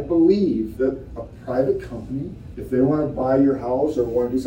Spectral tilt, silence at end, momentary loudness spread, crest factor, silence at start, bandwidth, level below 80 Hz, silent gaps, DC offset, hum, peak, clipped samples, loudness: -9 dB/octave; 0 s; 16 LU; 16 dB; 0 s; 16 kHz; -42 dBFS; none; under 0.1%; none; -6 dBFS; under 0.1%; -21 LUFS